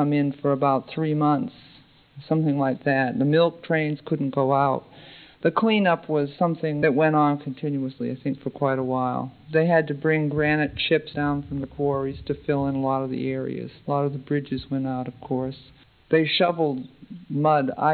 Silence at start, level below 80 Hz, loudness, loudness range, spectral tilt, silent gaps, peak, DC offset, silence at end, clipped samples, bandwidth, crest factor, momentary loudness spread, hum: 0 s; -54 dBFS; -24 LUFS; 4 LU; -10.5 dB/octave; none; -6 dBFS; under 0.1%; 0 s; under 0.1%; 4.7 kHz; 18 dB; 9 LU; none